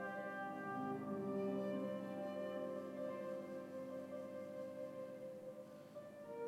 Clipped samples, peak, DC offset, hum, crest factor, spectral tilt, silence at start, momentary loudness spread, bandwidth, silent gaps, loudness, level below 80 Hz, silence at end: under 0.1%; -32 dBFS; under 0.1%; none; 14 dB; -7 dB/octave; 0 s; 10 LU; 16.5 kHz; none; -47 LUFS; under -90 dBFS; 0 s